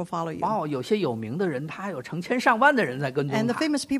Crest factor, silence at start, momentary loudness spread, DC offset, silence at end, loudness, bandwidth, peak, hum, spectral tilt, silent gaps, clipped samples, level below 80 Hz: 18 dB; 0 s; 12 LU; under 0.1%; 0 s; -25 LUFS; 15 kHz; -6 dBFS; none; -5.5 dB/octave; none; under 0.1%; -64 dBFS